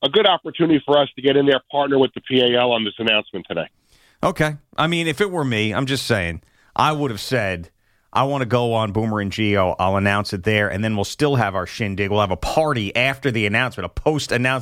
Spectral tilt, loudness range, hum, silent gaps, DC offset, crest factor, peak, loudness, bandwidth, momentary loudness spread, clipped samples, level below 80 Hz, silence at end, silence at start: -5.5 dB/octave; 4 LU; none; none; under 0.1%; 16 dB; -4 dBFS; -20 LUFS; 16 kHz; 7 LU; under 0.1%; -44 dBFS; 0 s; 0 s